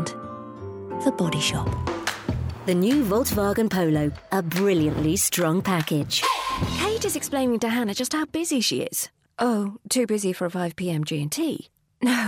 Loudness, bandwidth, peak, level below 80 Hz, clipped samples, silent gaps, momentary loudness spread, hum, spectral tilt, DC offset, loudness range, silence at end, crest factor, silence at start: -24 LUFS; 17 kHz; -10 dBFS; -44 dBFS; under 0.1%; none; 8 LU; none; -4.5 dB/octave; under 0.1%; 3 LU; 0 s; 14 dB; 0 s